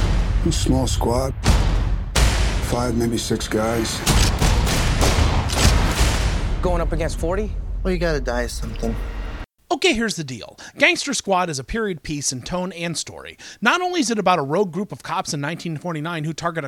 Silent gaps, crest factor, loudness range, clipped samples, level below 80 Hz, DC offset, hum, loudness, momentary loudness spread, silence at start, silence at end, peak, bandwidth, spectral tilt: none; 20 dB; 4 LU; under 0.1%; -24 dBFS; under 0.1%; none; -21 LUFS; 10 LU; 0 s; 0 s; -2 dBFS; 17 kHz; -4.5 dB/octave